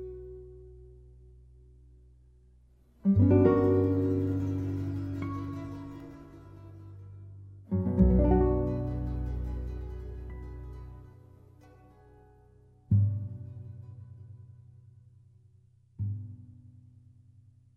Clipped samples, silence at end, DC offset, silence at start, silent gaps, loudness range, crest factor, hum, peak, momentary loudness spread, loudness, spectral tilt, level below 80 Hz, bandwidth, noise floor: under 0.1%; 1.25 s; under 0.1%; 0 s; none; 17 LU; 20 dB; none; -10 dBFS; 26 LU; -29 LUFS; -11.5 dB/octave; -40 dBFS; 4 kHz; -62 dBFS